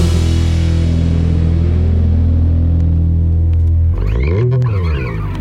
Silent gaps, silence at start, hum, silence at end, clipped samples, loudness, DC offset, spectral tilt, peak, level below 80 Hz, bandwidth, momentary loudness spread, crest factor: none; 0 s; none; 0 s; under 0.1%; -14 LUFS; under 0.1%; -8 dB/octave; -2 dBFS; -16 dBFS; 8.6 kHz; 2 LU; 10 dB